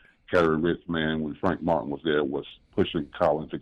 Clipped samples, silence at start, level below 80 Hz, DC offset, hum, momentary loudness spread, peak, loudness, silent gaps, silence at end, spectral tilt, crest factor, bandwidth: under 0.1%; 0.3 s; -54 dBFS; under 0.1%; none; 5 LU; -12 dBFS; -27 LUFS; none; 0 s; -7.5 dB/octave; 16 dB; 9.6 kHz